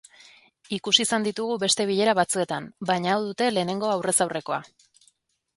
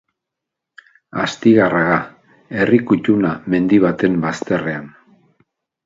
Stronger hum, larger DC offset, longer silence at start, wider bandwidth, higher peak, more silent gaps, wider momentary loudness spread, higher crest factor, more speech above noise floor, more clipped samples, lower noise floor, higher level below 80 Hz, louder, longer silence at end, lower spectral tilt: neither; neither; second, 0.7 s vs 1.15 s; first, 12 kHz vs 7.8 kHz; about the same, -2 dBFS vs 0 dBFS; neither; second, 10 LU vs 13 LU; first, 24 dB vs 18 dB; second, 42 dB vs 66 dB; neither; second, -66 dBFS vs -82 dBFS; second, -68 dBFS vs -52 dBFS; second, -24 LUFS vs -16 LUFS; about the same, 0.9 s vs 0.95 s; second, -3 dB/octave vs -7 dB/octave